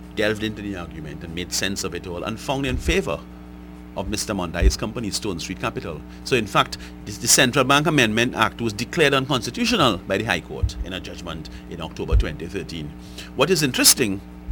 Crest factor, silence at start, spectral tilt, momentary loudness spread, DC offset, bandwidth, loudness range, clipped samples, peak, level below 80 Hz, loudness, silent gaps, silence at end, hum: 22 dB; 0 s; -3.5 dB/octave; 18 LU; under 0.1%; over 20 kHz; 8 LU; under 0.1%; 0 dBFS; -32 dBFS; -21 LUFS; none; 0 s; none